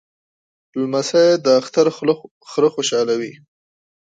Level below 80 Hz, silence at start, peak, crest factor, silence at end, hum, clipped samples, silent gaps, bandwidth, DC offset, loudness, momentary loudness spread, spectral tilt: -70 dBFS; 0.75 s; -2 dBFS; 16 dB; 0.75 s; none; under 0.1%; 2.31-2.41 s; 9.2 kHz; under 0.1%; -18 LUFS; 11 LU; -4 dB/octave